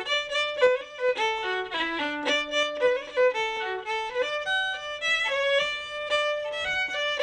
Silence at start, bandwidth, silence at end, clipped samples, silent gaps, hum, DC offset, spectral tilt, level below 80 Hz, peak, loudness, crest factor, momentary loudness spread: 0 s; 10.5 kHz; 0 s; under 0.1%; none; none; under 0.1%; -1 dB/octave; -60 dBFS; -12 dBFS; -26 LUFS; 16 dB; 5 LU